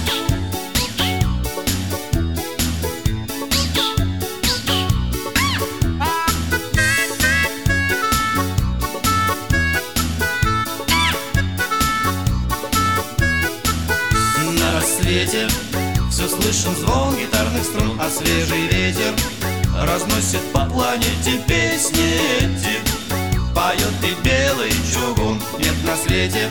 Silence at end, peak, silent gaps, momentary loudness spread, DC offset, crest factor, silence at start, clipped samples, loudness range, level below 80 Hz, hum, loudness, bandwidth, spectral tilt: 0 s; -2 dBFS; none; 5 LU; 0.9%; 16 dB; 0 s; under 0.1%; 2 LU; -28 dBFS; none; -18 LUFS; over 20 kHz; -3.5 dB/octave